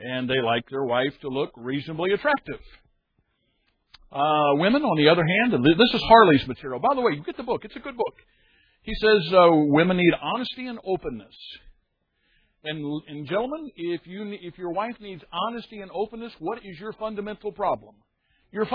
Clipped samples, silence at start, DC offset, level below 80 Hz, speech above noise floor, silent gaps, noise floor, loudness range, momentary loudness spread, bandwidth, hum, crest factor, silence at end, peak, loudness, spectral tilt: under 0.1%; 0 s; under 0.1%; -52 dBFS; 49 dB; none; -72 dBFS; 13 LU; 18 LU; 5.2 kHz; none; 24 dB; 0 s; 0 dBFS; -23 LUFS; -8 dB/octave